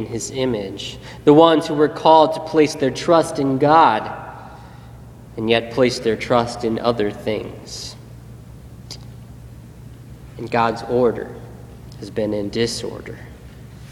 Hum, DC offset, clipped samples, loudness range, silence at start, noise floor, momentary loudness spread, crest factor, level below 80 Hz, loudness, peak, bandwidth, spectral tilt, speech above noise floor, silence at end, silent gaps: none; under 0.1%; under 0.1%; 12 LU; 0 s; -39 dBFS; 27 LU; 20 dB; -46 dBFS; -18 LUFS; 0 dBFS; 14 kHz; -5.5 dB/octave; 21 dB; 0 s; none